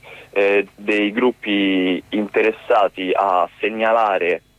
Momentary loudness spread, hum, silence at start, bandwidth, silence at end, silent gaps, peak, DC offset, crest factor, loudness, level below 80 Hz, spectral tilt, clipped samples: 4 LU; none; 0.05 s; 11 kHz; 0.2 s; none; -6 dBFS; under 0.1%; 12 dB; -18 LUFS; -60 dBFS; -6 dB/octave; under 0.1%